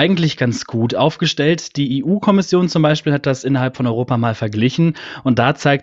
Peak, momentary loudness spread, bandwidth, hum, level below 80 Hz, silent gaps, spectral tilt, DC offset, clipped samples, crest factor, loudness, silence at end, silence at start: 0 dBFS; 5 LU; 8 kHz; none; -52 dBFS; none; -6 dB/octave; under 0.1%; under 0.1%; 16 dB; -17 LUFS; 0 s; 0 s